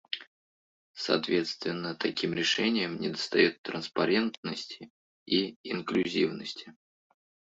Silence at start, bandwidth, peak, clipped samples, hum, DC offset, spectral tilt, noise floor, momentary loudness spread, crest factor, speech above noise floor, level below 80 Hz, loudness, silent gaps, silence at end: 0.1 s; 7.8 kHz; -10 dBFS; under 0.1%; none; under 0.1%; -4.5 dB/octave; under -90 dBFS; 13 LU; 22 dB; over 60 dB; -72 dBFS; -30 LUFS; 0.27-0.94 s, 3.58-3.64 s, 4.37-4.43 s, 4.90-5.26 s, 5.56-5.64 s; 0.85 s